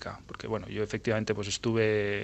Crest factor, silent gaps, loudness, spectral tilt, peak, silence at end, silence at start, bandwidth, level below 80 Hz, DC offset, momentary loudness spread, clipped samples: 18 dB; none; -30 LUFS; -5 dB/octave; -14 dBFS; 0 s; 0 s; 8.8 kHz; -56 dBFS; under 0.1%; 10 LU; under 0.1%